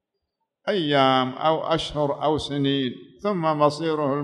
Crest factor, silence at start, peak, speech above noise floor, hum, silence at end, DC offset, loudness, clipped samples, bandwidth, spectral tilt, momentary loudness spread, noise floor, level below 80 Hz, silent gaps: 18 dB; 0.65 s; -6 dBFS; 57 dB; none; 0 s; under 0.1%; -23 LUFS; under 0.1%; 11 kHz; -6 dB/octave; 8 LU; -79 dBFS; -54 dBFS; none